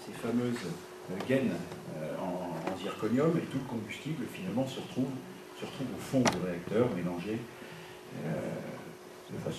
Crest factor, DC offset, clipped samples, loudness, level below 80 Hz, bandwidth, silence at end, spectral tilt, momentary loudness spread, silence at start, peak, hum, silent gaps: 22 dB; under 0.1%; under 0.1%; -35 LUFS; -66 dBFS; 13.5 kHz; 0 s; -6 dB/octave; 15 LU; 0 s; -12 dBFS; none; none